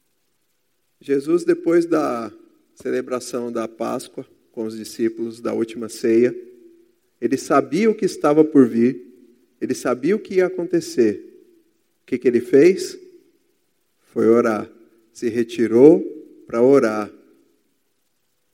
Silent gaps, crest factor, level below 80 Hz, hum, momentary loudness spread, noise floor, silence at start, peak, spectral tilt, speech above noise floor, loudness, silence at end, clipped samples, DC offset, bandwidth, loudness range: none; 20 dB; -70 dBFS; none; 17 LU; -71 dBFS; 1.1 s; 0 dBFS; -6 dB/octave; 53 dB; -19 LUFS; 1.45 s; under 0.1%; under 0.1%; 15.5 kHz; 6 LU